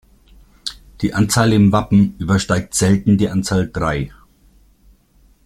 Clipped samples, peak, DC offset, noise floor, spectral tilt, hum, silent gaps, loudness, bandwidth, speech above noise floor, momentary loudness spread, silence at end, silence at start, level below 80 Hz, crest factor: under 0.1%; -2 dBFS; under 0.1%; -53 dBFS; -5.5 dB/octave; none; none; -16 LUFS; 14.5 kHz; 38 dB; 16 LU; 1.35 s; 0.65 s; -40 dBFS; 16 dB